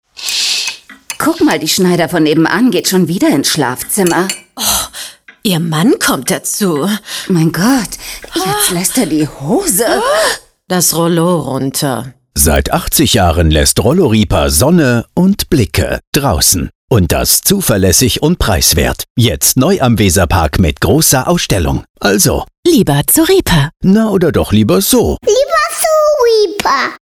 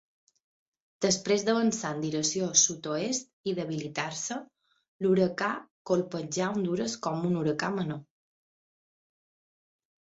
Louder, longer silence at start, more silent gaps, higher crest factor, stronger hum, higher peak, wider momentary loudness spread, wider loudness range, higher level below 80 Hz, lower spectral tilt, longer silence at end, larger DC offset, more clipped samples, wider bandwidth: first, -11 LUFS vs -29 LUFS; second, 0.2 s vs 1 s; about the same, 16.07-16.12 s, 16.75-16.88 s, 19.10-19.15 s, 21.90-21.94 s, 22.58-22.63 s vs 3.33-3.44 s, 4.88-4.99 s, 5.71-5.85 s; second, 12 dB vs 22 dB; neither; first, 0 dBFS vs -8 dBFS; second, 6 LU vs 9 LU; about the same, 3 LU vs 5 LU; first, -26 dBFS vs -70 dBFS; about the same, -4 dB/octave vs -3.5 dB/octave; second, 0.1 s vs 2.15 s; neither; neither; first, over 20 kHz vs 8.2 kHz